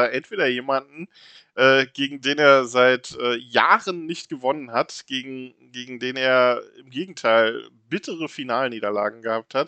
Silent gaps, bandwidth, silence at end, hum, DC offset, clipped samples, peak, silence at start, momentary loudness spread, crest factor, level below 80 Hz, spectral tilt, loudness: none; 8.8 kHz; 0 s; none; under 0.1%; under 0.1%; 0 dBFS; 0 s; 18 LU; 22 dB; -76 dBFS; -4 dB/octave; -21 LUFS